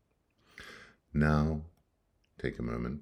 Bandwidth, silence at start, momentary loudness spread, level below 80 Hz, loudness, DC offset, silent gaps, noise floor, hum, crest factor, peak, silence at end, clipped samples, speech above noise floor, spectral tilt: 10.5 kHz; 0.55 s; 23 LU; -46 dBFS; -33 LUFS; under 0.1%; none; -74 dBFS; none; 22 dB; -14 dBFS; 0 s; under 0.1%; 44 dB; -8 dB/octave